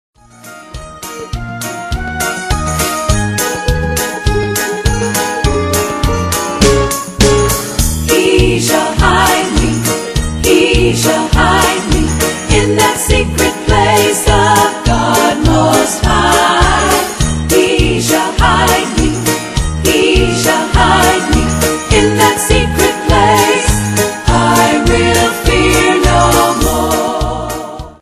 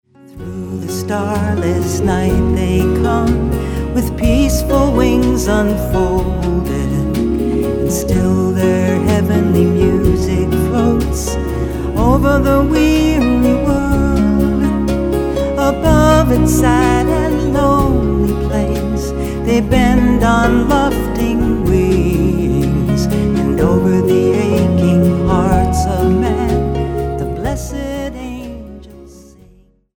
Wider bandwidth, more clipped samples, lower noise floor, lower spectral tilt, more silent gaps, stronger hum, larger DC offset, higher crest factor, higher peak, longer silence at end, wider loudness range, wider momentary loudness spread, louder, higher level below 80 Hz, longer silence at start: second, 14.5 kHz vs 19.5 kHz; first, 0.2% vs under 0.1%; second, -34 dBFS vs -47 dBFS; second, -4 dB/octave vs -7 dB/octave; neither; neither; neither; about the same, 12 dB vs 14 dB; about the same, 0 dBFS vs 0 dBFS; second, 0.1 s vs 0.75 s; about the same, 4 LU vs 3 LU; about the same, 7 LU vs 8 LU; first, -11 LUFS vs -14 LUFS; about the same, -20 dBFS vs -22 dBFS; first, 0.45 s vs 0.3 s